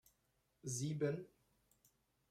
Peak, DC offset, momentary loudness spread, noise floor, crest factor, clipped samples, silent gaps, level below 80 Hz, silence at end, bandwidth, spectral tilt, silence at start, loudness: -28 dBFS; under 0.1%; 14 LU; -82 dBFS; 20 dB; under 0.1%; none; -80 dBFS; 1.05 s; 15 kHz; -5.5 dB/octave; 0.65 s; -43 LUFS